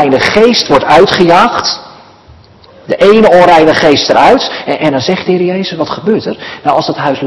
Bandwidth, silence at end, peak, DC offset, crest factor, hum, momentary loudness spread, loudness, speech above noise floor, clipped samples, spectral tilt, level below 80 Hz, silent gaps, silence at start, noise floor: 12 kHz; 0 s; 0 dBFS; under 0.1%; 8 dB; none; 11 LU; -8 LUFS; 30 dB; 5%; -5 dB/octave; -40 dBFS; none; 0 s; -38 dBFS